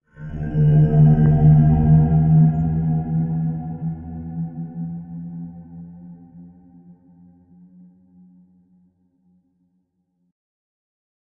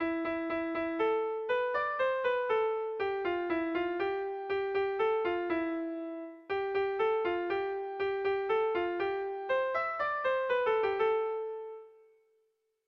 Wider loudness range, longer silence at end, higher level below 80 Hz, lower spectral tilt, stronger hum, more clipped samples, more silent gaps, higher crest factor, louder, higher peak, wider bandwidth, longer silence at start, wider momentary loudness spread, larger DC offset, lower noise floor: first, 21 LU vs 2 LU; first, 4.85 s vs 0.95 s; first, -36 dBFS vs -68 dBFS; first, -13 dB/octave vs -6.5 dB/octave; neither; neither; neither; about the same, 16 dB vs 14 dB; first, -17 LUFS vs -32 LUFS; first, -4 dBFS vs -20 dBFS; second, 2.1 kHz vs 6 kHz; first, 0.2 s vs 0 s; first, 21 LU vs 6 LU; neither; second, -69 dBFS vs -76 dBFS